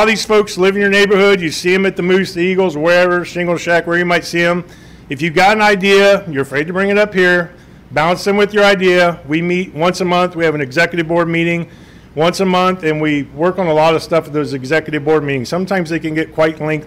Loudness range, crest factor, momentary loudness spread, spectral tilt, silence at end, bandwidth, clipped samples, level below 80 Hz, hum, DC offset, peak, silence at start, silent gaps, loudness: 3 LU; 10 dB; 8 LU; -5 dB/octave; 0 s; 16 kHz; under 0.1%; -46 dBFS; none; under 0.1%; -4 dBFS; 0 s; none; -13 LUFS